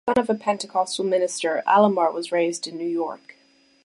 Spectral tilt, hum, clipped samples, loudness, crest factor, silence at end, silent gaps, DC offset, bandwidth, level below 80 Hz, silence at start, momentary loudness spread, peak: -4 dB/octave; none; under 0.1%; -23 LUFS; 18 dB; 0.7 s; none; under 0.1%; 11.5 kHz; -64 dBFS; 0.05 s; 10 LU; -4 dBFS